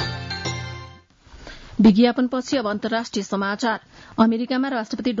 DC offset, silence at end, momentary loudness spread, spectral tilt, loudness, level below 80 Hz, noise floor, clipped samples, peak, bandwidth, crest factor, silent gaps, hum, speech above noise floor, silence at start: under 0.1%; 0 s; 17 LU; -5.5 dB/octave; -21 LUFS; -50 dBFS; -47 dBFS; under 0.1%; -6 dBFS; 7.8 kHz; 16 dB; none; none; 27 dB; 0 s